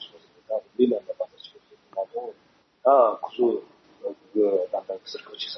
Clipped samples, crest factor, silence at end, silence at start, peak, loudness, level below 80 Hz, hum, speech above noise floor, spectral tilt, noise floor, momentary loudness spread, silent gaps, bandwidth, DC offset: under 0.1%; 20 dB; 0 s; 0 s; -6 dBFS; -25 LUFS; -80 dBFS; none; 39 dB; -6 dB/octave; -61 dBFS; 18 LU; none; 6.2 kHz; under 0.1%